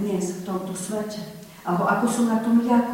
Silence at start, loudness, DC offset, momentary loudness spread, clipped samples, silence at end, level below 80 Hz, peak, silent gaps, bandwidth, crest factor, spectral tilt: 0 s; -24 LUFS; under 0.1%; 14 LU; under 0.1%; 0 s; -62 dBFS; -8 dBFS; none; 16.5 kHz; 16 dB; -5.5 dB/octave